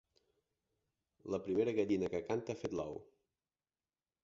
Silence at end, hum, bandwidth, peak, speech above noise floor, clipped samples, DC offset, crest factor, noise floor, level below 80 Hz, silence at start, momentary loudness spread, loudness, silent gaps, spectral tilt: 1.2 s; none; 7.6 kHz; -22 dBFS; over 52 dB; under 0.1%; under 0.1%; 20 dB; under -90 dBFS; -68 dBFS; 1.25 s; 12 LU; -38 LUFS; none; -6.5 dB/octave